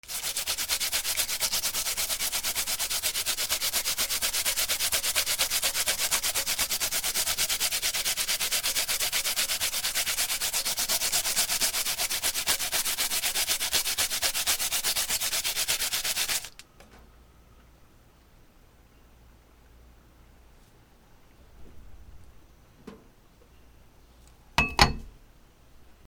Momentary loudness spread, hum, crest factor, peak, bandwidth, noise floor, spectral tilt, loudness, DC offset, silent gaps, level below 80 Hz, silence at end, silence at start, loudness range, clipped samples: 3 LU; none; 30 dB; 0 dBFS; over 20 kHz; -57 dBFS; 0.5 dB/octave; -25 LUFS; under 0.1%; none; -48 dBFS; 0.15 s; 0.05 s; 6 LU; under 0.1%